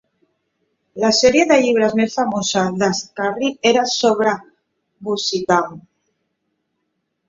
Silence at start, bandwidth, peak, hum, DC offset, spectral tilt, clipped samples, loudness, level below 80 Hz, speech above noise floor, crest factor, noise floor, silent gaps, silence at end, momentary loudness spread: 0.95 s; 7.8 kHz; -2 dBFS; none; under 0.1%; -3.5 dB/octave; under 0.1%; -17 LUFS; -58 dBFS; 56 dB; 18 dB; -73 dBFS; none; 1.5 s; 10 LU